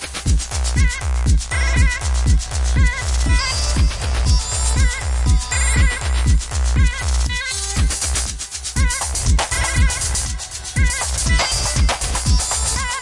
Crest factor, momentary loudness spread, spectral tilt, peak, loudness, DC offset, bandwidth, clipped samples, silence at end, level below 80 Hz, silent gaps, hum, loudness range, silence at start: 14 dB; 3 LU; -3 dB/octave; -4 dBFS; -19 LUFS; 0.3%; 11.5 kHz; under 0.1%; 0 s; -20 dBFS; none; none; 1 LU; 0 s